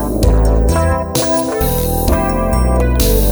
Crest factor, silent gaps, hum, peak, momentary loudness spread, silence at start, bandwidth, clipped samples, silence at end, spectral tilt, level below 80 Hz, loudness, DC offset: 12 dB; none; none; 0 dBFS; 2 LU; 0 s; over 20 kHz; under 0.1%; 0 s; -5.5 dB/octave; -16 dBFS; -14 LUFS; under 0.1%